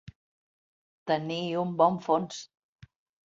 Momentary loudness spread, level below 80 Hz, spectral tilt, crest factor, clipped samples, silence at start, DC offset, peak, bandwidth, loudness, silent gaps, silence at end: 15 LU; -68 dBFS; -6 dB/octave; 22 dB; under 0.1%; 0.05 s; under 0.1%; -10 dBFS; 7.8 kHz; -28 LUFS; 0.15-1.06 s; 0.8 s